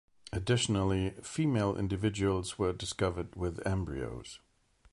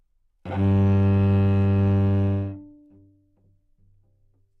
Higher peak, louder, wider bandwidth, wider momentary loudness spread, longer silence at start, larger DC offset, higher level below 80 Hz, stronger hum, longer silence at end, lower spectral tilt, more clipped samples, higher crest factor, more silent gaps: second, -16 dBFS vs -12 dBFS; second, -33 LUFS vs -21 LUFS; first, 11.5 kHz vs 4.1 kHz; second, 11 LU vs 14 LU; about the same, 0.35 s vs 0.45 s; neither; about the same, -48 dBFS vs -50 dBFS; neither; second, 0.55 s vs 1.95 s; second, -5.5 dB/octave vs -11 dB/octave; neither; about the same, 16 dB vs 12 dB; neither